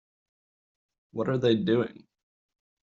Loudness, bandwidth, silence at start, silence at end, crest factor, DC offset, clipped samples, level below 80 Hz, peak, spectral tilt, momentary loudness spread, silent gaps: -27 LUFS; 7.4 kHz; 1.15 s; 1.05 s; 18 dB; under 0.1%; under 0.1%; -68 dBFS; -12 dBFS; -6 dB/octave; 11 LU; none